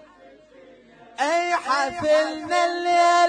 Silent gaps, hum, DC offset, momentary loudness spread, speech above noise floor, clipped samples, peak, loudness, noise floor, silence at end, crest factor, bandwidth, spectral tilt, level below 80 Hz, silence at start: none; none; under 0.1%; 5 LU; 30 dB; under 0.1%; -8 dBFS; -22 LUFS; -50 dBFS; 0 s; 14 dB; 10.5 kHz; -2.5 dB/octave; -62 dBFS; 1.2 s